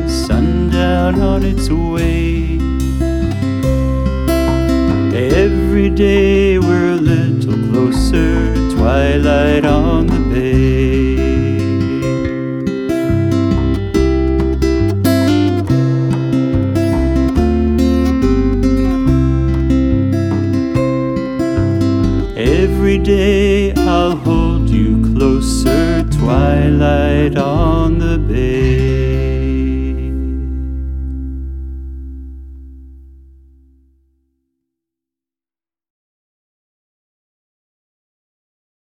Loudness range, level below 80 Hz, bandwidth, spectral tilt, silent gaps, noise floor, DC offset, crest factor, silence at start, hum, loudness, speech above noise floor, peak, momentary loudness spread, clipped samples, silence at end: 5 LU; -20 dBFS; 16 kHz; -7.5 dB/octave; none; under -90 dBFS; under 0.1%; 12 dB; 0 s; none; -14 LUFS; over 77 dB; -2 dBFS; 6 LU; under 0.1%; 5.8 s